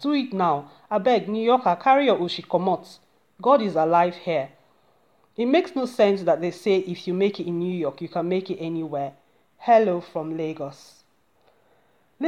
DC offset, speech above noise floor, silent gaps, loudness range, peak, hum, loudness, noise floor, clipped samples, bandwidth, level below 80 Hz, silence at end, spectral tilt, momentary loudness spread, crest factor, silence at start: under 0.1%; 41 dB; none; 5 LU; -6 dBFS; none; -23 LUFS; -64 dBFS; under 0.1%; 13 kHz; -76 dBFS; 0 s; -7 dB/octave; 11 LU; 18 dB; 0 s